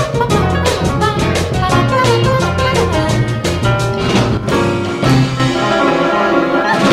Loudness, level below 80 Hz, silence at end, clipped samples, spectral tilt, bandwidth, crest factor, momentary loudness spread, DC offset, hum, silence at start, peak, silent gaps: -13 LUFS; -30 dBFS; 0 s; under 0.1%; -5.5 dB/octave; 15 kHz; 12 dB; 3 LU; under 0.1%; none; 0 s; 0 dBFS; none